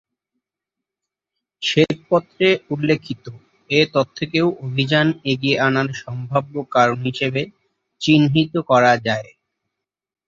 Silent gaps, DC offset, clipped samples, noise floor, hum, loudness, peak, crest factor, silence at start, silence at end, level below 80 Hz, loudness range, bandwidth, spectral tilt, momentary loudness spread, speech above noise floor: none; under 0.1%; under 0.1%; -85 dBFS; none; -18 LUFS; -2 dBFS; 18 dB; 1.6 s; 1.05 s; -58 dBFS; 3 LU; 7.6 kHz; -6 dB/octave; 10 LU; 67 dB